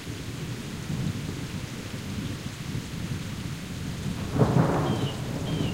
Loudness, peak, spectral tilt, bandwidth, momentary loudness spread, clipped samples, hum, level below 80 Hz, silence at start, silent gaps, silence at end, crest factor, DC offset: -30 LUFS; -8 dBFS; -6 dB/octave; 16 kHz; 11 LU; under 0.1%; none; -44 dBFS; 0 s; none; 0 s; 22 dB; under 0.1%